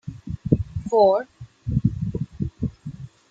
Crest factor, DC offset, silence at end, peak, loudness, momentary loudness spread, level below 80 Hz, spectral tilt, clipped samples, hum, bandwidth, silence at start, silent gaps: 22 dB; under 0.1%; 0.25 s; -2 dBFS; -23 LUFS; 20 LU; -42 dBFS; -9 dB/octave; under 0.1%; none; 7.8 kHz; 0.05 s; none